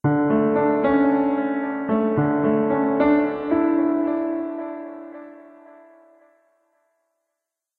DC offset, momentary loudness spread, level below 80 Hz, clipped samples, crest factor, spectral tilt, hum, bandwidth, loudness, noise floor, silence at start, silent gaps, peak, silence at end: under 0.1%; 14 LU; -56 dBFS; under 0.1%; 16 dB; -11 dB/octave; none; 4.2 kHz; -21 LUFS; -82 dBFS; 0.05 s; none; -6 dBFS; 2.35 s